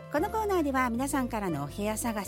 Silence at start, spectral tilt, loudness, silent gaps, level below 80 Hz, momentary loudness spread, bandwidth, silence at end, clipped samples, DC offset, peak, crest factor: 0 s; -5 dB/octave; -30 LUFS; none; -46 dBFS; 5 LU; 17 kHz; 0 s; under 0.1%; under 0.1%; -14 dBFS; 16 dB